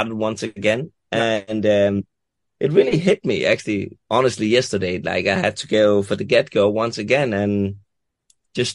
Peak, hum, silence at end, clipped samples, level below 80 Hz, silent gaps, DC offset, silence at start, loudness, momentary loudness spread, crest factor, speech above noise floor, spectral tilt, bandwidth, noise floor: -2 dBFS; none; 0 s; under 0.1%; -56 dBFS; none; under 0.1%; 0 s; -19 LUFS; 9 LU; 18 dB; 45 dB; -5.5 dB/octave; 11.5 kHz; -64 dBFS